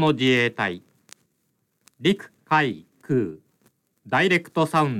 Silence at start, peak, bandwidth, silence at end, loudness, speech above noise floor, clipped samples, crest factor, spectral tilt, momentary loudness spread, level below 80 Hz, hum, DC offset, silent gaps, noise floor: 0 s; -6 dBFS; 14.5 kHz; 0 s; -23 LUFS; 50 dB; under 0.1%; 18 dB; -6 dB/octave; 10 LU; -68 dBFS; none; under 0.1%; none; -72 dBFS